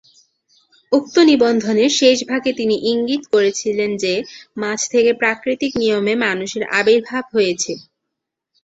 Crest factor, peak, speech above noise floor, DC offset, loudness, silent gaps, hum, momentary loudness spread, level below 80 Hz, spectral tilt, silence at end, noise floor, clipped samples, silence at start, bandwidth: 16 dB; -2 dBFS; 63 dB; under 0.1%; -17 LUFS; none; none; 9 LU; -60 dBFS; -3 dB/octave; 0.8 s; -80 dBFS; under 0.1%; 0.9 s; 8 kHz